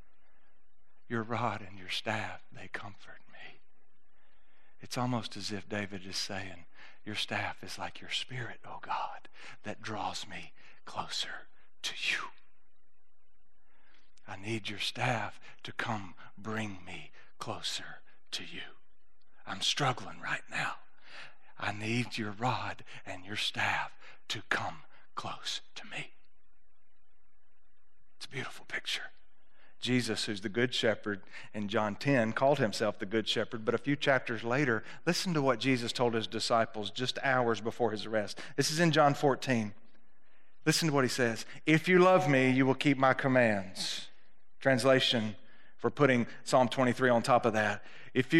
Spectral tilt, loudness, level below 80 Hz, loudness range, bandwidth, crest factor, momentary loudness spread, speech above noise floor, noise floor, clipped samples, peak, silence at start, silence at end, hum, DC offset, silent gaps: -4.5 dB/octave; -32 LUFS; -74 dBFS; 12 LU; 13.5 kHz; 24 dB; 19 LU; 44 dB; -76 dBFS; under 0.1%; -10 dBFS; 1.1 s; 0 s; none; 0.7%; none